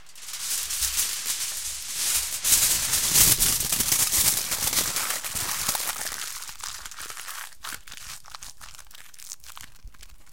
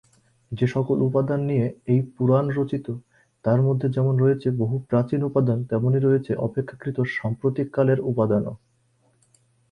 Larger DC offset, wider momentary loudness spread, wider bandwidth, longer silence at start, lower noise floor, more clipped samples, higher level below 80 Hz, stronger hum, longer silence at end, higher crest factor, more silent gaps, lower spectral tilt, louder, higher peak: first, 0.7% vs under 0.1%; first, 22 LU vs 7 LU; first, 17 kHz vs 5.2 kHz; second, 0.15 s vs 0.5 s; second, -47 dBFS vs -64 dBFS; neither; first, -48 dBFS vs -58 dBFS; neither; second, 0.25 s vs 1.15 s; first, 24 dB vs 16 dB; neither; second, 0.5 dB/octave vs -10 dB/octave; about the same, -22 LUFS vs -23 LUFS; first, -4 dBFS vs -8 dBFS